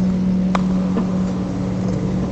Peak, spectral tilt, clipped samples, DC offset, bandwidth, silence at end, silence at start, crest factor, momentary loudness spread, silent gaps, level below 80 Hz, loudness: -2 dBFS; -8.5 dB/octave; under 0.1%; under 0.1%; 8 kHz; 0 s; 0 s; 16 dB; 4 LU; none; -36 dBFS; -20 LUFS